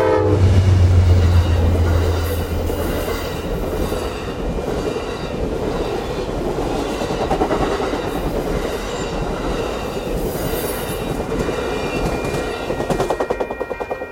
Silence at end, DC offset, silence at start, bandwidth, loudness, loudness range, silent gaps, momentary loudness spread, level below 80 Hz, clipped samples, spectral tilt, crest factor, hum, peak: 0 s; under 0.1%; 0 s; 16.5 kHz; -20 LUFS; 6 LU; none; 10 LU; -28 dBFS; under 0.1%; -6.5 dB/octave; 16 dB; none; -2 dBFS